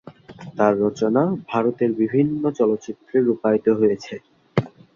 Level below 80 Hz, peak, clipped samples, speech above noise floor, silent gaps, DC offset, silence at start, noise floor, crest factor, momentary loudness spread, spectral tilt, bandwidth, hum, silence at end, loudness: -60 dBFS; -2 dBFS; under 0.1%; 20 dB; none; under 0.1%; 0.05 s; -40 dBFS; 18 dB; 10 LU; -8 dB/octave; 7.2 kHz; none; 0.25 s; -21 LUFS